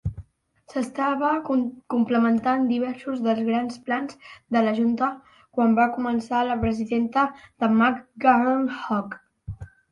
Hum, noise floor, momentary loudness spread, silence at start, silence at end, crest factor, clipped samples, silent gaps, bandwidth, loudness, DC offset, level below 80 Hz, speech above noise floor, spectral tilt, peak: none; -55 dBFS; 13 LU; 0.05 s; 0.25 s; 18 dB; under 0.1%; none; 10.5 kHz; -23 LUFS; under 0.1%; -50 dBFS; 32 dB; -7 dB/octave; -6 dBFS